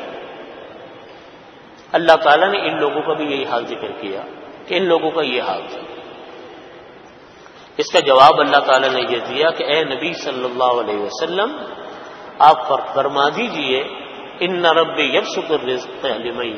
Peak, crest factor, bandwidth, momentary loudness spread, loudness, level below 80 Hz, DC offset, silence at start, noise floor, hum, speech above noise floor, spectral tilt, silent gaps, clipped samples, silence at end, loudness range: 0 dBFS; 18 dB; 10 kHz; 22 LU; -17 LUFS; -62 dBFS; under 0.1%; 0 s; -42 dBFS; none; 25 dB; -3.5 dB/octave; none; under 0.1%; 0 s; 7 LU